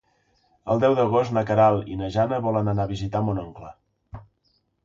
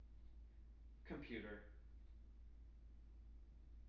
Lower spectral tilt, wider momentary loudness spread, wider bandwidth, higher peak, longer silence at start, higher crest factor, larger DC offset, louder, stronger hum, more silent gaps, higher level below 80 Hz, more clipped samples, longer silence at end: first, -8 dB/octave vs -5.5 dB/octave; about the same, 12 LU vs 13 LU; first, 7.4 kHz vs 6.2 kHz; first, -6 dBFS vs -38 dBFS; first, 0.65 s vs 0 s; about the same, 18 dB vs 20 dB; neither; first, -23 LUFS vs -59 LUFS; neither; neither; first, -48 dBFS vs -60 dBFS; neither; first, 0.65 s vs 0 s